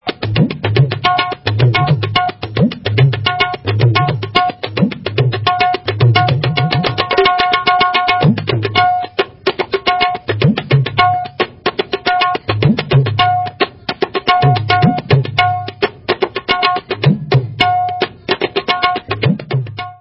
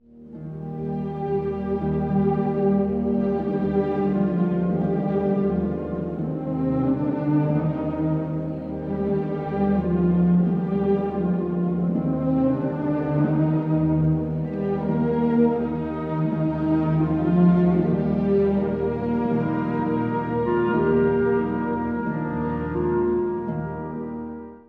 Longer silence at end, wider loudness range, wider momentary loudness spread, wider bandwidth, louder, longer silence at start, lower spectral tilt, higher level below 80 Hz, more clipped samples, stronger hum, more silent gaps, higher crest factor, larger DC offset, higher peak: about the same, 0.05 s vs 0.1 s; about the same, 2 LU vs 3 LU; about the same, 6 LU vs 8 LU; first, 5.8 kHz vs 4.5 kHz; first, -14 LUFS vs -23 LUFS; about the same, 0.05 s vs 0.15 s; second, -8 dB/octave vs -11.5 dB/octave; about the same, -40 dBFS vs -44 dBFS; neither; neither; neither; about the same, 14 dB vs 16 dB; neither; first, 0 dBFS vs -8 dBFS